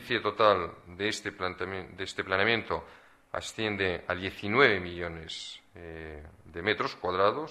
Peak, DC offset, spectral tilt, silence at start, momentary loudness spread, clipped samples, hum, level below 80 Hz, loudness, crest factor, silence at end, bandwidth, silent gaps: -6 dBFS; under 0.1%; -4.5 dB/octave; 0 s; 18 LU; under 0.1%; none; -58 dBFS; -30 LUFS; 26 dB; 0 s; 13.5 kHz; none